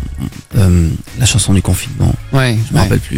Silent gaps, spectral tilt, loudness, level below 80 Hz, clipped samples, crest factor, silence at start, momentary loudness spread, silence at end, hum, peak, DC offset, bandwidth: none; -5 dB/octave; -13 LUFS; -26 dBFS; under 0.1%; 12 dB; 0 s; 7 LU; 0 s; none; 0 dBFS; under 0.1%; 16.5 kHz